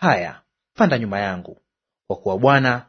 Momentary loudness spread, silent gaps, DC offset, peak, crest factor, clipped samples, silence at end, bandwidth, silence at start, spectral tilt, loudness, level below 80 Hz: 16 LU; none; under 0.1%; 0 dBFS; 20 dB; under 0.1%; 0.05 s; 6.6 kHz; 0 s; -7 dB/octave; -19 LUFS; -58 dBFS